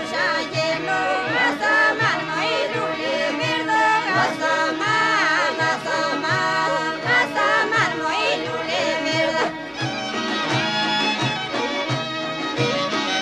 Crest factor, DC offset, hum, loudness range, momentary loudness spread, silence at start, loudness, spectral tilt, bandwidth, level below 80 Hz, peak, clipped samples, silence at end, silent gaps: 14 dB; under 0.1%; none; 3 LU; 6 LU; 0 s; -20 LUFS; -3.5 dB/octave; 13.5 kHz; -58 dBFS; -6 dBFS; under 0.1%; 0 s; none